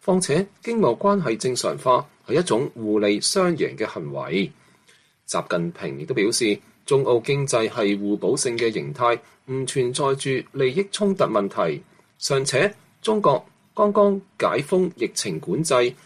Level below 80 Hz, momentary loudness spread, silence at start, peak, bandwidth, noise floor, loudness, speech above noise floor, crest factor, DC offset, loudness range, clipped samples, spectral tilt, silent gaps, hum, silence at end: -64 dBFS; 8 LU; 0.05 s; -6 dBFS; 13.5 kHz; -58 dBFS; -22 LUFS; 36 dB; 18 dB; under 0.1%; 3 LU; under 0.1%; -4.5 dB/octave; none; none; 0.1 s